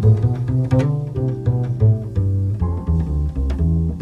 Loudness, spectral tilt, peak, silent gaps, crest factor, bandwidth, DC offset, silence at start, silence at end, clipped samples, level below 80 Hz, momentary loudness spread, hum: -20 LUFS; -10 dB/octave; -4 dBFS; none; 14 dB; 5.6 kHz; under 0.1%; 0 s; 0 s; under 0.1%; -26 dBFS; 5 LU; none